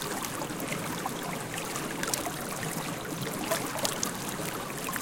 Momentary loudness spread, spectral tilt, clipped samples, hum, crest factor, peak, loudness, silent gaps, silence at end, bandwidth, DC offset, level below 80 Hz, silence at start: 4 LU; -3 dB/octave; under 0.1%; none; 26 dB; -8 dBFS; -33 LUFS; none; 0 s; 17 kHz; under 0.1%; -58 dBFS; 0 s